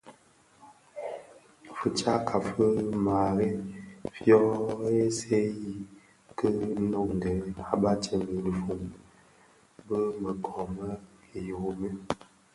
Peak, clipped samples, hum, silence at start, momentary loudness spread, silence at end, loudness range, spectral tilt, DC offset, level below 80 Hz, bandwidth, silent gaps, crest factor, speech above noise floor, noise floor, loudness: -8 dBFS; under 0.1%; none; 0.05 s; 15 LU; 0.4 s; 8 LU; -6.5 dB/octave; under 0.1%; -54 dBFS; 11.5 kHz; none; 22 dB; 33 dB; -61 dBFS; -29 LUFS